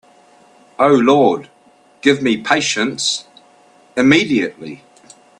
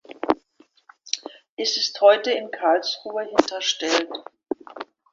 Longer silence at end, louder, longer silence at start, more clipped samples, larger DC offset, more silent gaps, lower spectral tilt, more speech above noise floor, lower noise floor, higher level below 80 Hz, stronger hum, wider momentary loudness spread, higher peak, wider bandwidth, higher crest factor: first, 0.65 s vs 0.3 s; first, -15 LUFS vs -22 LUFS; first, 0.8 s vs 0.1 s; neither; neither; second, none vs 1.49-1.57 s; first, -4 dB/octave vs -1.5 dB/octave; about the same, 36 dB vs 37 dB; second, -51 dBFS vs -59 dBFS; first, -58 dBFS vs -64 dBFS; neither; second, 13 LU vs 16 LU; about the same, 0 dBFS vs 0 dBFS; first, 11 kHz vs 7.6 kHz; second, 18 dB vs 24 dB